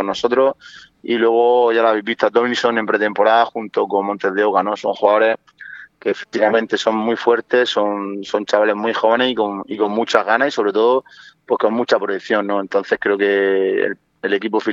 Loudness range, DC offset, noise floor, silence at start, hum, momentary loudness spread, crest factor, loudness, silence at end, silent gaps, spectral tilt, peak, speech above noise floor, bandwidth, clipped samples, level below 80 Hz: 2 LU; under 0.1%; -38 dBFS; 0 s; none; 8 LU; 18 dB; -17 LUFS; 0 s; none; -4.5 dB/octave; 0 dBFS; 21 dB; 7.8 kHz; under 0.1%; -68 dBFS